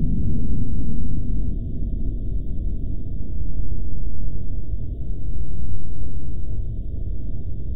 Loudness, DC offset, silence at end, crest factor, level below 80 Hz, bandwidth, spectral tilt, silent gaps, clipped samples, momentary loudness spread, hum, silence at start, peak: -30 LUFS; under 0.1%; 0 s; 8 dB; -26 dBFS; 0.7 kHz; -13.5 dB/octave; none; under 0.1%; 6 LU; none; 0 s; -6 dBFS